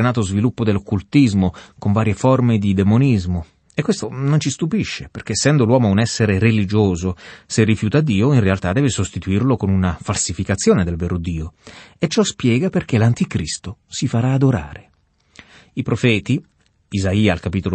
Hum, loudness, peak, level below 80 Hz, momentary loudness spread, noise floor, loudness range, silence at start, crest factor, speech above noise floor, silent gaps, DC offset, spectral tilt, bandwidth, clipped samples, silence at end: none; -18 LUFS; -2 dBFS; -42 dBFS; 10 LU; -56 dBFS; 4 LU; 0 s; 16 dB; 39 dB; none; under 0.1%; -6 dB/octave; 8.8 kHz; under 0.1%; 0 s